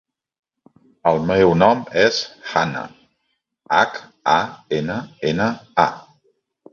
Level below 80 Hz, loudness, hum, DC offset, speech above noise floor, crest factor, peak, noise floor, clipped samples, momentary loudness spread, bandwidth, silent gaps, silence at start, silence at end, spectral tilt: -50 dBFS; -19 LUFS; none; under 0.1%; 54 dB; 20 dB; 0 dBFS; -73 dBFS; under 0.1%; 9 LU; 7.4 kHz; none; 1.05 s; 0.7 s; -5.5 dB/octave